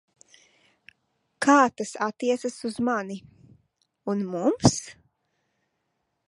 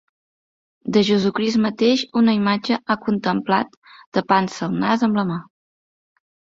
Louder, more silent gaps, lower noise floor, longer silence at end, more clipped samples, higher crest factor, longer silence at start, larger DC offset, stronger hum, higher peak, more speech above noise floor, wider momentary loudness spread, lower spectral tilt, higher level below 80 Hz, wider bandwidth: second, -25 LUFS vs -20 LUFS; second, none vs 3.77-3.82 s, 4.06-4.12 s; second, -77 dBFS vs under -90 dBFS; first, 1.4 s vs 1.15 s; neither; first, 24 dB vs 18 dB; first, 1.4 s vs 0.85 s; neither; neither; about the same, -4 dBFS vs -2 dBFS; second, 53 dB vs over 71 dB; first, 17 LU vs 8 LU; about the same, -5 dB/octave vs -6 dB/octave; about the same, -56 dBFS vs -60 dBFS; first, 11.5 kHz vs 7.6 kHz